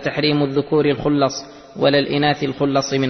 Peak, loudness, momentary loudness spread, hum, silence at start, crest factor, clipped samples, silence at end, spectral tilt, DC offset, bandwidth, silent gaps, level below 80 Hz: -4 dBFS; -18 LUFS; 4 LU; none; 0 s; 16 dB; under 0.1%; 0 s; -5.5 dB/octave; under 0.1%; 6.4 kHz; none; -50 dBFS